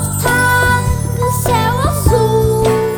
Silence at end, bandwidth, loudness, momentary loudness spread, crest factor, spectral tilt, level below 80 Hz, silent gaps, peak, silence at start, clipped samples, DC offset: 0 s; over 20 kHz; -13 LUFS; 5 LU; 12 dB; -5 dB/octave; -24 dBFS; none; 0 dBFS; 0 s; under 0.1%; under 0.1%